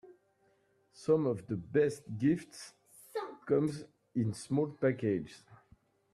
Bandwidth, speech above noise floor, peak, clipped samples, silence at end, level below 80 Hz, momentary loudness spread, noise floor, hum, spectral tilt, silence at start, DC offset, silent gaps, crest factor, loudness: 13.5 kHz; 39 dB; -16 dBFS; under 0.1%; 0.6 s; -70 dBFS; 15 LU; -72 dBFS; none; -7 dB/octave; 0.05 s; under 0.1%; none; 18 dB; -34 LUFS